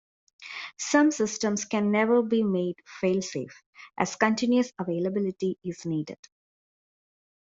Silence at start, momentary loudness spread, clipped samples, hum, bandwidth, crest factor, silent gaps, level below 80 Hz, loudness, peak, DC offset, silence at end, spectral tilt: 0.4 s; 16 LU; under 0.1%; none; 7.8 kHz; 22 dB; 3.66-3.73 s; -70 dBFS; -27 LUFS; -6 dBFS; under 0.1%; 1.25 s; -5 dB/octave